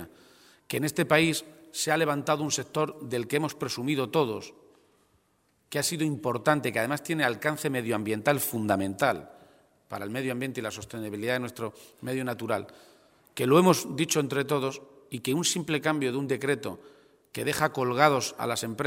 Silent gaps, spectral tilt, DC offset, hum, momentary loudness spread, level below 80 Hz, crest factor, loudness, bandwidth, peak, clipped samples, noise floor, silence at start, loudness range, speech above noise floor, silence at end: none; -4.5 dB/octave; under 0.1%; none; 14 LU; -68 dBFS; 24 dB; -28 LUFS; 16 kHz; -4 dBFS; under 0.1%; -69 dBFS; 0 s; 6 LU; 42 dB; 0 s